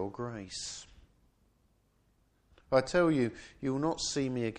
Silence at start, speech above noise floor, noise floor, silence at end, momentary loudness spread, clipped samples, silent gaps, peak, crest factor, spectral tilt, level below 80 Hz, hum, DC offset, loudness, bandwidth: 0 s; 39 dB; -71 dBFS; 0 s; 13 LU; under 0.1%; none; -12 dBFS; 22 dB; -5 dB/octave; -60 dBFS; none; under 0.1%; -32 LUFS; 10.5 kHz